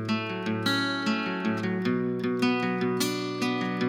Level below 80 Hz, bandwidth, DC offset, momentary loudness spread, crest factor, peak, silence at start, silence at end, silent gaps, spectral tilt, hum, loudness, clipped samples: -72 dBFS; 16 kHz; under 0.1%; 3 LU; 16 dB; -12 dBFS; 0 s; 0 s; none; -5 dB/octave; none; -28 LUFS; under 0.1%